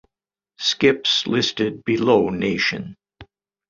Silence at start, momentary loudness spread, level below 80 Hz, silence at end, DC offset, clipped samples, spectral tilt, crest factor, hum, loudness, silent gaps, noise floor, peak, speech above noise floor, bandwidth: 0.6 s; 7 LU; -54 dBFS; 0.45 s; under 0.1%; under 0.1%; -4 dB/octave; 20 dB; none; -19 LUFS; none; -88 dBFS; -2 dBFS; 68 dB; 7.6 kHz